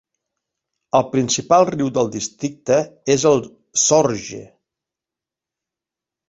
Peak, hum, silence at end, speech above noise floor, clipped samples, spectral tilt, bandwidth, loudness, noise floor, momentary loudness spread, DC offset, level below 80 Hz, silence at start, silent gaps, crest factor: 0 dBFS; none; 1.85 s; 70 dB; under 0.1%; -4 dB/octave; 8 kHz; -18 LUFS; -87 dBFS; 11 LU; under 0.1%; -58 dBFS; 0.95 s; none; 20 dB